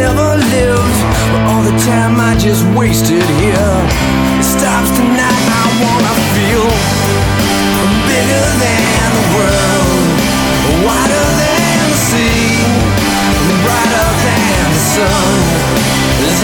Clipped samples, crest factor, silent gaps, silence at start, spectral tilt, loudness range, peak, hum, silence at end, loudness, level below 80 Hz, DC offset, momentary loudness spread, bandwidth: under 0.1%; 10 dB; none; 0 s; -4.5 dB/octave; 0 LU; 0 dBFS; none; 0 s; -10 LUFS; -24 dBFS; under 0.1%; 1 LU; 19 kHz